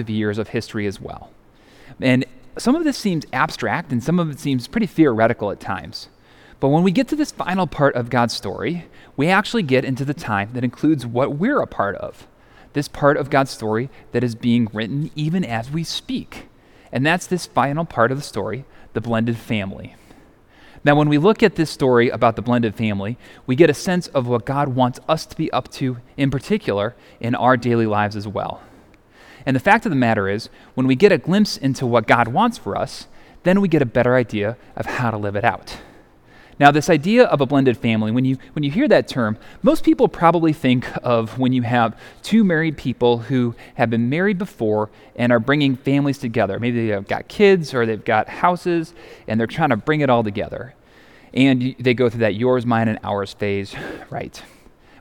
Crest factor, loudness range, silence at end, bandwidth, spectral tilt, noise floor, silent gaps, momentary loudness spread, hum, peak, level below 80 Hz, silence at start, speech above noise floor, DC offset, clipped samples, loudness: 20 dB; 4 LU; 0.55 s; 17.5 kHz; -6.5 dB/octave; -49 dBFS; none; 12 LU; none; 0 dBFS; -48 dBFS; 0 s; 30 dB; under 0.1%; under 0.1%; -19 LUFS